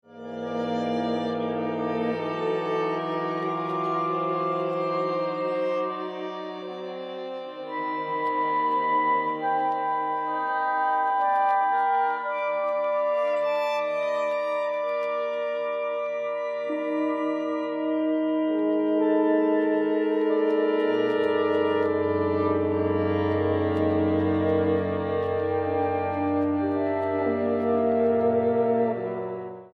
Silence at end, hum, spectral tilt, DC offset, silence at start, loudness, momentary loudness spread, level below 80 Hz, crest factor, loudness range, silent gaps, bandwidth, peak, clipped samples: 0.1 s; none; -8 dB/octave; under 0.1%; 0.1 s; -26 LUFS; 7 LU; -68 dBFS; 14 dB; 4 LU; none; 7.4 kHz; -12 dBFS; under 0.1%